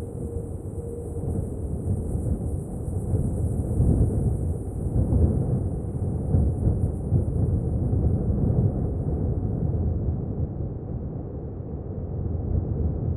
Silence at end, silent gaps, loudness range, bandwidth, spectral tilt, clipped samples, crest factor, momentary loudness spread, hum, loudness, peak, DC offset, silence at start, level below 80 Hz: 0 s; none; 5 LU; 11 kHz; -11.5 dB/octave; under 0.1%; 16 dB; 10 LU; none; -27 LUFS; -8 dBFS; under 0.1%; 0 s; -30 dBFS